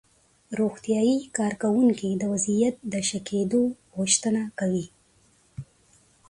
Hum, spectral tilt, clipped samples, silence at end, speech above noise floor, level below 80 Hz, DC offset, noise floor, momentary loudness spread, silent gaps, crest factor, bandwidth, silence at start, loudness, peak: none; -4.5 dB/octave; under 0.1%; 0.65 s; 37 dB; -62 dBFS; under 0.1%; -62 dBFS; 14 LU; none; 18 dB; 11.5 kHz; 0.5 s; -25 LUFS; -8 dBFS